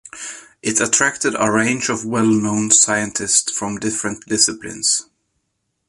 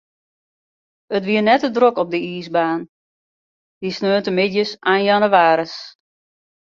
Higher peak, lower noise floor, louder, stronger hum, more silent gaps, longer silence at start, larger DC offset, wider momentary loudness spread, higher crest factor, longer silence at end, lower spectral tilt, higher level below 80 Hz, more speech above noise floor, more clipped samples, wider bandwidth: about the same, 0 dBFS vs 0 dBFS; second, -72 dBFS vs under -90 dBFS; about the same, -17 LUFS vs -17 LUFS; neither; second, none vs 2.89-3.81 s; second, 0.05 s vs 1.1 s; neither; about the same, 10 LU vs 12 LU; about the same, 20 dB vs 18 dB; about the same, 0.85 s vs 0.85 s; second, -2 dB/octave vs -6 dB/octave; first, -56 dBFS vs -66 dBFS; second, 54 dB vs over 73 dB; neither; first, 11.5 kHz vs 7.4 kHz